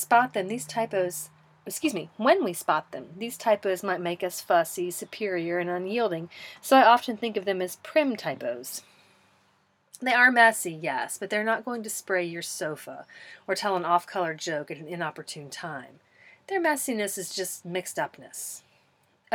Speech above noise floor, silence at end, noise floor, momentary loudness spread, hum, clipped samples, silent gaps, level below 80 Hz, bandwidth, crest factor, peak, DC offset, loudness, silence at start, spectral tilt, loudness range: 40 dB; 0 s; -67 dBFS; 17 LU; none; under 0.1%; none; -82 dBFS; 18.5 kHz; 24 dB; -4 dBFS; under 0.1%; -27 LUFS; 0 s; -3 dB/octave; 7 LU